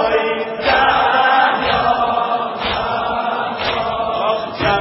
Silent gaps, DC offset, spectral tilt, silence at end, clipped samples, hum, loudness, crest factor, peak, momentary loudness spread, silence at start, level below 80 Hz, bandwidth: none; under 0.1%; -8.5 dB/octave; 0 s; under 0.1%; none; -16 LUFS; 16 dB; 0 dBFS; 7 LU; 0 s; -40 dBFS; 5.8 kHz